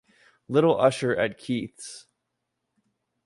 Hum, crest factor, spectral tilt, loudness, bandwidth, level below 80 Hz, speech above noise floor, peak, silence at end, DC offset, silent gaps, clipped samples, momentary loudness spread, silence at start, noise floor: none; 20 dB; -5.5 dB/octave; -24 LUFS; 11.5 kHz; -64 dBFS; 56 dB; -6 dBFS; 1.25 s; under 0.1%; none; under 0.1%; 20 LU; 0.5 s; -81 dBFS